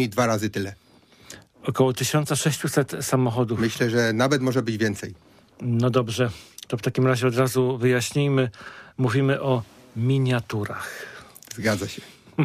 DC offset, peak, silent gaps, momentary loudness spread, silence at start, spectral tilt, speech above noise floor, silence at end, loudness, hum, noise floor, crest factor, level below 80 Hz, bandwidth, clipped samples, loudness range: under 0.1%; -6 dBFS; none; 16 LU; 0 s; -5.5 dB/octave; 25 dB; 0 s; -24 LUFS; none; -48 dBFS; 18 dB; -60 dBFS; 15.5 kHz; under 0.1%; 3 LU